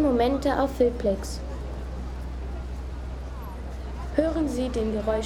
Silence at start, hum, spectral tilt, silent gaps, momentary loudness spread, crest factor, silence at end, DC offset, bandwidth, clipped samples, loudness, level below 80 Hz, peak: 0 s; none; -6.5 dB/octave; none; 13 LU; 18 dB; 0 s; under 0.1%; 14.5 kHz; under 0.1%; -28 LUFS; -34 dBFS; -8 dBFS